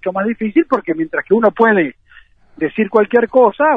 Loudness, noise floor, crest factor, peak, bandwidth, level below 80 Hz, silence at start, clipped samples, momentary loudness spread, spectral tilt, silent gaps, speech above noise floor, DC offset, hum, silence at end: -15 LUFS; -46 dBFS; 14 dB; 0 dBFS; 5 kHz; -54 dBFS; 0 s; under 0.1%; 8 LU; -9 dB/octave; none; 32 dB; under 0.1%; none; 0 s